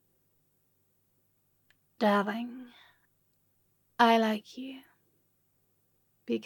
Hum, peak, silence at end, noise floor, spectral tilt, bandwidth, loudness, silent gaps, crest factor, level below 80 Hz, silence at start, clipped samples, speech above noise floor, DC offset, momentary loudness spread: none; -8 dBFS; 0.05 s; -73 dBFS; -5.5 dB/octave; 17.5 kHz; -28 LUFS; none; 26 dB; under -90 dBFS; 2 s; under 0.1%; 45 dB; under 0.1%; 24 LU